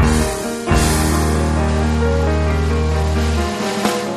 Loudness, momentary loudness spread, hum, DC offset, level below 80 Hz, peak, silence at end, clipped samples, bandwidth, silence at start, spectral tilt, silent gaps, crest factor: -17 LUFS; 4 LU; none; under 0.1%; -20 dBFS; -4 dBFS; 0 s; under 0.1%; 13.5 kHz; 0 s; -5.5 dB/octave; none; 14 dB